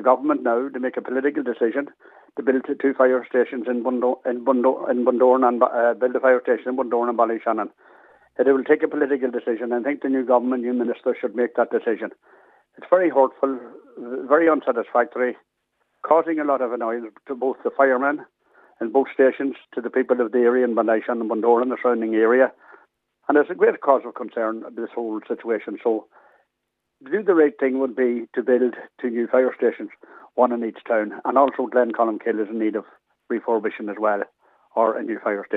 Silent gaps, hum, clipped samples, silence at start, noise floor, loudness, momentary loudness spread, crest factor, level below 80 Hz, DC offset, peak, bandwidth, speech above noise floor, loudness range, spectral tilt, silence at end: none; none; under 0.1%; 0 s; -78 dBFS; -21 LUFS; 11 LU; 20 dB; -84 dBFS; under 0.1%; -2 dBFS; 4 kHz; 57 dB; 4 LU; -8.5 dB/octave; 0 s